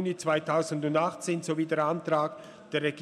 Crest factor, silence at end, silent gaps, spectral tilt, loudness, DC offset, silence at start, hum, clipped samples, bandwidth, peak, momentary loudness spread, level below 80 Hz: 16 dB; 0 s; none; -5.5 dB/octave; -29 LUFS; under 0.1%; 0 s; none; under 0.1%; 13 kHz; -14 dBFS; 6 LU; -78 dBFS